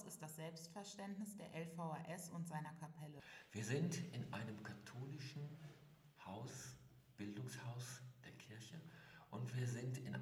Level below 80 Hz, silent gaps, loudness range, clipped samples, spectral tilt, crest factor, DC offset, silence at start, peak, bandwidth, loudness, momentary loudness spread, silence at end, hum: -82 dBFS; none; 6 LU; under 0.1%; -5.5 dB/octave; 20 dB; under 0.1%; 0 s; -30 dBFS; 16.5 kHz; -50 LUFS; 14 LU; 0 s; none